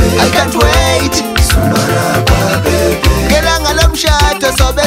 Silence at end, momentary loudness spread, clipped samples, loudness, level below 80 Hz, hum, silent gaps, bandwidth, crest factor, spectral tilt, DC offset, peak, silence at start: 0 s; 2 LU; under 0.1%; -10 LUFS; -16 dBFS; none; none; 16.5 kHz; 10 dB; -4 dB/octave; under 0.1%; 0 dBFS; 0 s